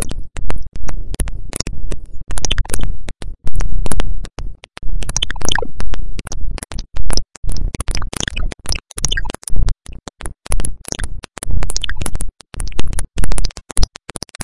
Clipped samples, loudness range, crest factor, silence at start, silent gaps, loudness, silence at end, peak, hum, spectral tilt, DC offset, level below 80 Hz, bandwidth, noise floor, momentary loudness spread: under 0.1%; 2 LU; 10 dB; 0 s; 7.37-7.43 s; -24 LUFS; 0.6 s; 0 dBFS; none; -3 dB/octave; under 0.1%; -22 dBFS; 12 kHz; -33 dBFS; 11 LU